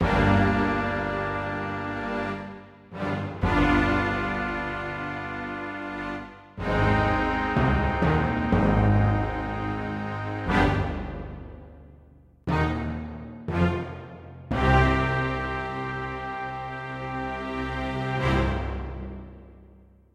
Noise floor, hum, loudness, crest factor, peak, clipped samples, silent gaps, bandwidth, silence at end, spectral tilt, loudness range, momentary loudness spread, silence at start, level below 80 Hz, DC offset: -53 dBFS; none; -26 LUFS; 20 dB; -6 dBFS; under 0.1%; none; 10 kHz; 0.5 s; -7.5 dB/octave; 6 LU; 16 LU; 0 s; -36 dBFS; under 0.1%